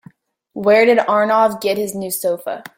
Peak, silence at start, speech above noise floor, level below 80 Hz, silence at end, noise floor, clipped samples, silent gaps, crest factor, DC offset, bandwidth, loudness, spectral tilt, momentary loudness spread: -2 dBFS; 0.55 s; 31 dB; -62 dBFS; 0.15 s; -47 dBFS; under 0.1%; none; 16 dB; under 0.1%; 17 kHz; -16 LUFS; -4 dB/octave; 10 LU